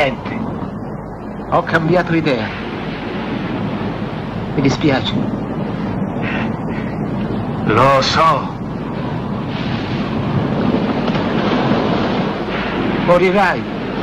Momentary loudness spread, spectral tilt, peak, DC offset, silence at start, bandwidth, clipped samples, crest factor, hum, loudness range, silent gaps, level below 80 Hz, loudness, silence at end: 11 LU; -6.5 dB/octave; 0 dBFS; under 0.1%; 0 s; 11 kHz; under 0.1%; 16 dB; none; 3 LU; none; -38 dBFS; -18 LUFS; 0 s